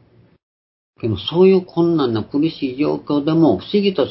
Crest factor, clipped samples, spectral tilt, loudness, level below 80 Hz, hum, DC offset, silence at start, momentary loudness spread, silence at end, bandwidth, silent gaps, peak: 16 dB; under 0.1%; -11.5 dB/octave; -17 LUFS; -50 dBFS; none; under 0.1%; 1.05 s; 8 LU; 0 s; 5.8 kHz; none; -2 dBFS